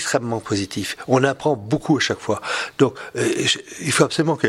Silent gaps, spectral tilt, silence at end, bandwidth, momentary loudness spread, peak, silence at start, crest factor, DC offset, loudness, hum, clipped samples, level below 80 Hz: none; -4 dB/octave; 0 s; 16 kHz; 6 LU; 0 dBFS; 0 s; 20 dB; under 0.1%; -21 LUFS; none; under 0.1%; -56 dBFS